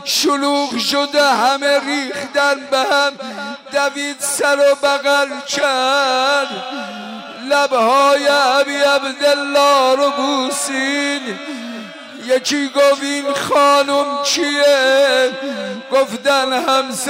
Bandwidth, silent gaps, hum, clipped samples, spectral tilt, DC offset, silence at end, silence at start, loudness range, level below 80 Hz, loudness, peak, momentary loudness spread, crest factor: 16 kHz; none; none; under 0.1%; -1.5 dB/octave; under 0.1%; 0 s; 0 s; 3 LU; -66 dBFS; -15 LUFS; -4 dBFS; 13 LU; 10 dB